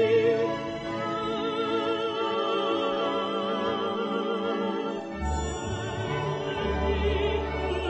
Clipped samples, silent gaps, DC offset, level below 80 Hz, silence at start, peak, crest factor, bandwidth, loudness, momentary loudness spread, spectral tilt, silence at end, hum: under 0.1%; none; under 0.1%; -40 dBFS; 0 s; -12 dBFS; 14 dB; 8.4 kHz; -28 LUFS; 5 LU; -5.5 dB/octave; 0 s; none